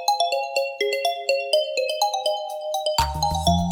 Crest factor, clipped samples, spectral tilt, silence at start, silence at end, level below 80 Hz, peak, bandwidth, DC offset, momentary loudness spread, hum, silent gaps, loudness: 18 dB; under 0.1%; -3.5 dB/octave; 0 s; 0 s; -38 dBFS; -6 dBFS; 19 kHz; under 0.1%; 4 LU; none; none; -23 LUFS